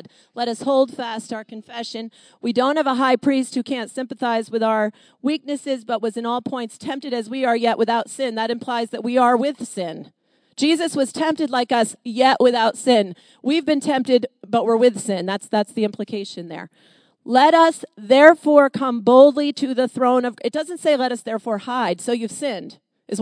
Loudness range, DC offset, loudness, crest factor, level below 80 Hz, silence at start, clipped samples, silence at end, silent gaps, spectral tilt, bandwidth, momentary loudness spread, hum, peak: 8 LU; under 0.1%; -19 LUFS; 20 dB; -76 dBFS; 0.35 s; under 0.1%; 0 s; none; -4 dB/octave; 11 kHz; 15 LU; none; 0 dBFS